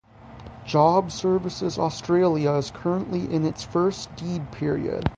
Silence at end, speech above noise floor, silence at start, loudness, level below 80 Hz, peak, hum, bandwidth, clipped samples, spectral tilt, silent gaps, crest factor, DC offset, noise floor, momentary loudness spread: 0 s; 20 dB; 0.2 s; -24 LUFS; -48 dBFS; -6 dBFS; none; 9.4 kHz; under 0.1%; -6.5 dB/octave; none; 18 dB; under 0.1%; -43 dBFS; 11 LU